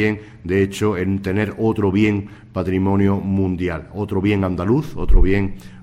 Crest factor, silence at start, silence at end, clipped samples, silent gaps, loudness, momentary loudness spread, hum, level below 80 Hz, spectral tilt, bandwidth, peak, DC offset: 16 dB; 0 s; 0 s; under 0.1%; none; -20 LUFS; 8 LU; none; -24 dBFS; -8 dB/octave; 12.5 kHz; -2 dBFS; under 0.1%